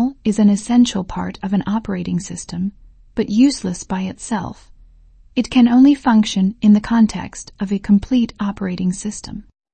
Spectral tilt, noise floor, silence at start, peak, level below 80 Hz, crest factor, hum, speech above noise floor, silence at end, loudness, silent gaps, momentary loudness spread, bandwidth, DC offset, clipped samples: -6 dB/octave; -47 dBFS; 0 s; -2 dBFS; -42 dBFS; 14 dB; none; 30 dB; 0.3 s; -17 LUFS; none; 14 LU; 8.8 kHz; under 0.1%; under 0.1%